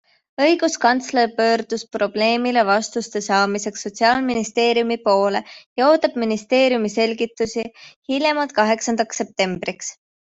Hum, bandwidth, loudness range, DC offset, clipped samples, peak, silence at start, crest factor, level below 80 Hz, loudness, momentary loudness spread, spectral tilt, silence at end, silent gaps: none; 8.2 kHz; 2 LU; under 0.1%; under 0.1%; -2 dBFS; 0.4 s; 16 dB; -62 dBFS; -19 LUFS; 10 LU; -3.5 dB/octave; 0.3 s; 5.66-5.76 s, 7.96-8.02 s